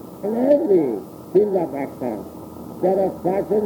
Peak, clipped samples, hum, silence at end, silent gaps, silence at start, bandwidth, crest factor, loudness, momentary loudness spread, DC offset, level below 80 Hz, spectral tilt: -4 dBFS; under 0.1%; none; 0 s; none; 0 s; 19.5 kHz; 16 dB; -21 LUFS; 14 LU; under 0.1%; -56 dBFS; -8.5 dB/octave